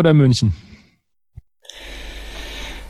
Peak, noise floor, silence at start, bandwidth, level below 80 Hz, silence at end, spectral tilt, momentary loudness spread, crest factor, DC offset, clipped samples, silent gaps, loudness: -2 dBFS; -61 dBFS; 0 s; 12.5 kHz; -38 dBFS; 0.05 s; -6.5 dB/octave; 24 LU; 18 dB; under 0.1%; under 0.1%; none; -18 LUFS